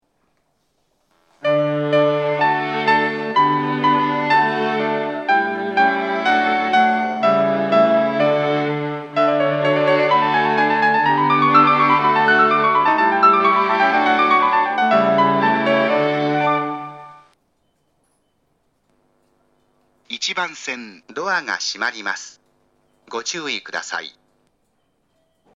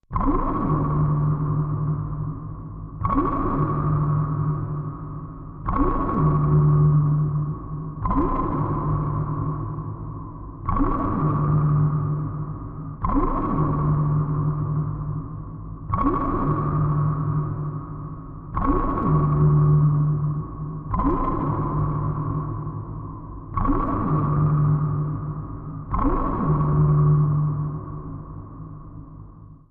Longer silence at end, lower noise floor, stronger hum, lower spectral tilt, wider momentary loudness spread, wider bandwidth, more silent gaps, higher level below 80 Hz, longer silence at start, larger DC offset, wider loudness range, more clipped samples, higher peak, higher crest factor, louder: first, 1.45 s vs 0.15 s; first, -67 dBFS vs -43 dBFS; neither; second, -4.5 dB/octave vs -13.5 dB/octave; second, 12 LU vs 16 LU; first, 8.8 kHz vs 2.5 kHz; neither; second, -74 dBFS vs -32 dBFS; first, 1.45 s vs 0.1 s; neither; first, 13 LU vs 4 LU; neither; first, 0 dBFS vs -8 dBFS; about the same, 18 dB vs 14 dB; first, -17 LUFS vs -23 LUFS